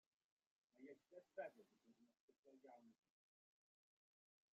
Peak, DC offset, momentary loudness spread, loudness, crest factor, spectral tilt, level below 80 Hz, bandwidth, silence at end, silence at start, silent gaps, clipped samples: -42 dBFS; under 0.1%; 12 LU; -61 LUFS; 24 dB; -4 dB/octave; under -90 dBFS; 7.2 kHz; 1.6 s; 0.75 s; 2.20-2.28 s, 2.38-2.43 s; under 0.1%